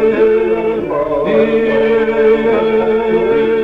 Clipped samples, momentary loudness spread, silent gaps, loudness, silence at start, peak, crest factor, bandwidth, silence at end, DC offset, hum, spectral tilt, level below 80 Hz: under 0.1%; 4 LU; none; -13 LUFS; 0 s; -2 dBFS; 10 dB; 4.8 kHz; 0 s; under 0.1%; none; -7.5 dB/octave; -40 dBFS